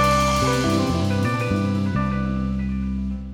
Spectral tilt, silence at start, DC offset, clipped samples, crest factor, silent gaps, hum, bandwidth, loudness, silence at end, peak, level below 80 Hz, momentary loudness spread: -6 dB/octave; 0 s; 0.2%; under 0.1%; 14 dB; none; none; 17.5 kHz; -22 LUFS; 0 s; -8 dBFS; -32 dBFS; 7 LU